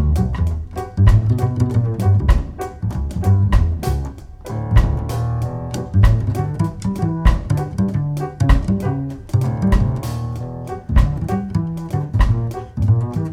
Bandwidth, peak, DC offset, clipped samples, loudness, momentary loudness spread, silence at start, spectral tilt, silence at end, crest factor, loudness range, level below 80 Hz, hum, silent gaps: 15 kHz; 0 dBFS; under 0.1%; under 0.1%; -19 LUFS; 10 LU; 0 s; -8 dB/octave; 0 s; 16 dB; 2 LU; -22 dBFS; none; none